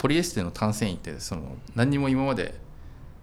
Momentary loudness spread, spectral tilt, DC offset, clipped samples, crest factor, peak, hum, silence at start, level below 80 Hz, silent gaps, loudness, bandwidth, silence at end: 22 LU; -5.5 dB/octave; under 0.1%; under 0.1%; 18 dB; -8 dBFS; none; 0 s; -44 dBFS; none; -27 LUFS; 16 kHz; 0 s